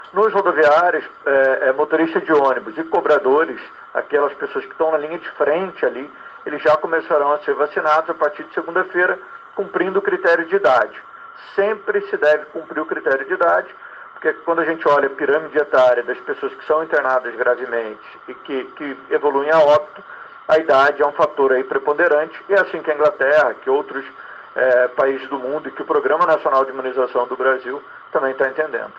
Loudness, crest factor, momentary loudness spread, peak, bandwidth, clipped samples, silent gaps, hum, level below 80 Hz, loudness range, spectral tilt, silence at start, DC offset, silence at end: -18 LUFS; 14 dB; 14 LU; -4 dBFS; 7.4 kHz; under 0.1%; none; none; -68 dBFS; 3 LU; -5.5 dB/octave; 0 s; under 0.1%; 0.05 s